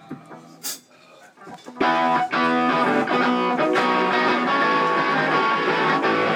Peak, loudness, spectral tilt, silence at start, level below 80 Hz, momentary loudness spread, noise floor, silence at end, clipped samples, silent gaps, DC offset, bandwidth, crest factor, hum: -10 dBFS; -20 LUFS; -4 dB/octave; 0.1 s; -68 dBFS; 13 LU; -49 dBFS; 0 s; under 0.1%; none; under 0.1%; 17 kHz; 12 dB; none